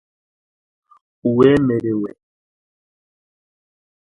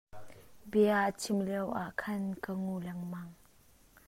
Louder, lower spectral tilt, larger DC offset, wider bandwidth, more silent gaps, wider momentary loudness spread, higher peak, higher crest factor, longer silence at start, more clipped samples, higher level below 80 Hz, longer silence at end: first, -17 LUFS vs -34 LUFS; first, -9 dB/octave vs -6 dB/octave; neither; second, 10.5 kHz vs 16 kHz; neither; second, 11 LU vs 15 LU; first, -2 dBFS vs -16 dBFS; about the same, 20 dB vs 18 dB; first, 1.25 s vs 0.15 s; neither; first, -52 dBFS vs -66 dBFS; first, 1.95 s vs 0.75 s